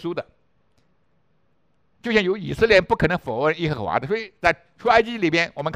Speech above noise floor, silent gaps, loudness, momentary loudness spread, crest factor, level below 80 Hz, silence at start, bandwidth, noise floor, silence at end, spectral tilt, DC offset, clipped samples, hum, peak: 47 dB; none; -21 LUFS; 9 LU; 22 dB; -46 dBFS; 0 s; 11.5 kHz; -68 dBFS; 0 s; -5.5 dB/octave; under 0.1%; under 0.1%; none; 0 dBFS